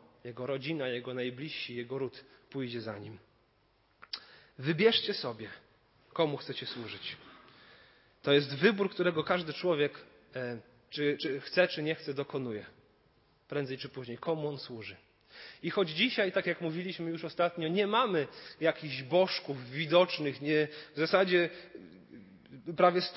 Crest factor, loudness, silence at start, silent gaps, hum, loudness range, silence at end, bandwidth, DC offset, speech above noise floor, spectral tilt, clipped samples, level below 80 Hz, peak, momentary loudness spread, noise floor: 22 dB; -32 LUFS; 0.25 s; none; none; 9 LU; 0 s; 5.8 kHz; under 0.1%; 38 dB; -9 dB/octave; under 0.1%; -76 dBFS; -12 dBFS; 16 LU; -70 dBFS